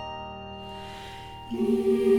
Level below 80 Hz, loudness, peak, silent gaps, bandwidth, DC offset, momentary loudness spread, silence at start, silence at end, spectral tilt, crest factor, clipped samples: -52 dBFS; -30 LUFS; -12 dBFS; none; 14.5 kHz; under 0.1%; 16 LU; 0 s; 0 s; -6.5 dB/octave; 16 dB; under 0.1%